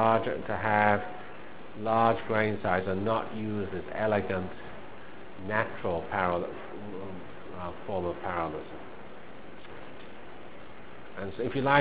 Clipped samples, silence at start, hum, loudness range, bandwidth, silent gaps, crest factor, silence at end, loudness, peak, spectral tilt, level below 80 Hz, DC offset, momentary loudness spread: under 0.1%; 0 s; none; 10 LU; 4 kHz; none; 24 dB; 0 s; -30 LUFS; -6 dBFS; -4.5 dB/octave; -54 dBFS; 1%; 21 LU